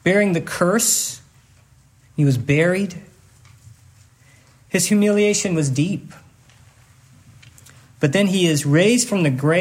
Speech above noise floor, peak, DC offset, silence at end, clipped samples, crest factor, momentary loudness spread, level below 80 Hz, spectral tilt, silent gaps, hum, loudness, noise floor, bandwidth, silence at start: 35 dB; -4 dBFS; under 0.1%; 0 s; under 0.1%; 16 dB; 10 LU; -58 dBFS; -4.5 dB/octave; none; none; -18 LUFS; -53 dBFS; 16 kHz; 0.05 s